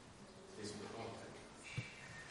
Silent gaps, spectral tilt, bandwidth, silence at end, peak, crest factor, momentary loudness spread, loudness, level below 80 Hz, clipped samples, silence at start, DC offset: none; -4.5 dB/octave; 11.5 kHz; 0 s; -32 dBFS; 18 dB; 8 LU; -51 LUFS; -72 dBFS; under 0.1%; 0 s; under 0.1%